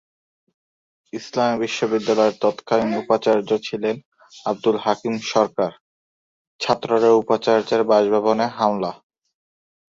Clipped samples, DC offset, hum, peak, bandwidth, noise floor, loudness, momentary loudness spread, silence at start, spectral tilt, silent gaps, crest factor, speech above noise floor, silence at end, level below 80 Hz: under 0.1%; under 0.1%; none; -2 dBFS; 7.8 kHz; under -90 dBFS; -20 LUFS; 10 LU; 1.15 s; -5 dB/octave; 4.05-4.12 s, 5.81-6.59 s; 18 dB; over 71 dB; 0.95 s; -64 dBFS